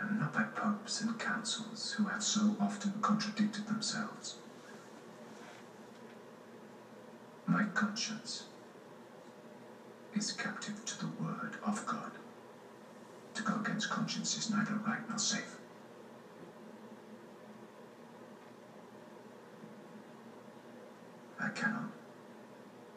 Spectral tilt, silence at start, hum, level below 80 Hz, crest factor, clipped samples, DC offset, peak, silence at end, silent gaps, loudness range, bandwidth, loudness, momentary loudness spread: -3.5 dB/octave; 0 s; none; under -90 dBFS; 20 dB; under 0.1%; under 0.1%; -20 dBFS; 0 s; none; 19 LU; 11.5 kHz; -36 LUFS; 20 LU